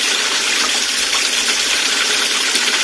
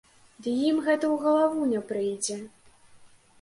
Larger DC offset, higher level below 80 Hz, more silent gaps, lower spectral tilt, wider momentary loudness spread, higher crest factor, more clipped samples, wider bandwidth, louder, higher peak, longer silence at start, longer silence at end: neither; first, -52 dBFS vs -70 dBFS; neither; second, 2 dB/octave vs -4 dB/octave; second, 1 LU vs 12 LU; about the same, 16 dB vs 16 dB; neither; about the same, 11 kHz vs 11.5 kHz; first, -14 LUFS vs -26 LUFS; first, 0 dBFS vs -12 dBFS; second, 0 s vs 0.4 s; second, 0 s vs 0.35 s